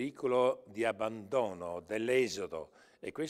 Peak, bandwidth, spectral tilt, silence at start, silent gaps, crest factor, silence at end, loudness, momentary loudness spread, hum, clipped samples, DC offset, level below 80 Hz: -16 dBFS; 14.5 kHz; -4.5 dB/octave; 0 s; none; 18 dB; 0 s; -34 LUFS; 14 LU; none; under 0.1%; under 0.1%; -72 dBFS